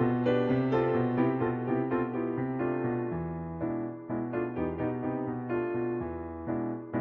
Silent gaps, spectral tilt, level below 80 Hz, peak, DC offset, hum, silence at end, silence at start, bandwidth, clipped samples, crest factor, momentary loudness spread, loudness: none; -10.5 dB/octave; -56 dBFS; -14 dBFS; under 0.1%; none; 0 s; 0 s; 4.3 kHz; under 0.1%; 16 dB; 8 LU; -31 LUFS